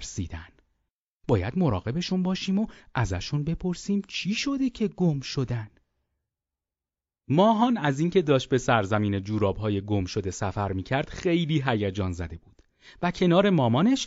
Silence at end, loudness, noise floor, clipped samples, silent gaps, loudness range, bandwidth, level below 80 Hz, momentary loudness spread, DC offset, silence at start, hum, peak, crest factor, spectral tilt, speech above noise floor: 0 s; -26 LUFS; under -90 dBFS; under 0.1%; 0.90-1.20 s; 5 LU; 7.8 kHz; -48 dBFS; 10 LU; under 0.1%; 0 s; none; -6 dBFS; 20 dB; -5.5 dB/octave; over 65 dB